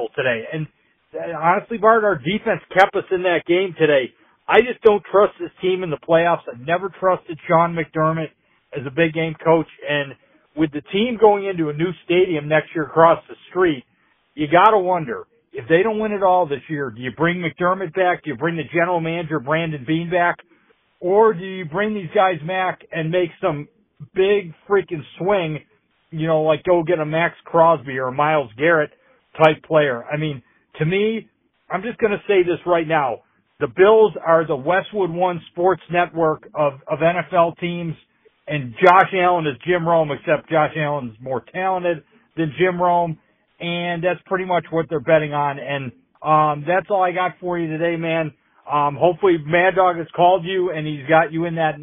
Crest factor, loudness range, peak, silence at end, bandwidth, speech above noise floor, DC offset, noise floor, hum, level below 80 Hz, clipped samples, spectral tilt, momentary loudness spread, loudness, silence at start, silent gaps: 20 dB; 4 LU; 0 dBFS; 0 s; 4 kHz; 40 dB; under 0.1%; -58 dBFS; none; -58 dBFS; under 0.1%; -4.5 dB/octave; 12 LU; -19 LUFS; 0 s; none